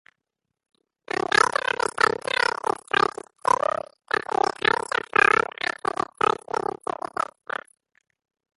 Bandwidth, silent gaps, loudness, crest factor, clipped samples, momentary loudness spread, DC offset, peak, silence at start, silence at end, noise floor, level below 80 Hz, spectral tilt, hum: 11.5 kHz; none; -24 LUFS; 24 dB; under 0.1%; 12 LU; under 0.1%; -2 dBFS; 1.35 s; 3.15 s; -83 dBFS; -62 dBFS; -2.5 dB/octave; none